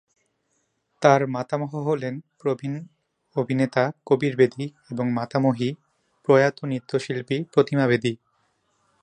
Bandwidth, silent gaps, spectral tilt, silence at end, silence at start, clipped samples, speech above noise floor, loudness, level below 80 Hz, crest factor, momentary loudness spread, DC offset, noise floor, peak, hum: 9.8 kHz; none; -7 dB/octave; 0.9 s; 1 s; under 0.1%; 49 dB; -23 LUFS; -68 dBFS; 22 dB; 13 LU; under 0.1%; -72 dBFS; -2 dBFS; none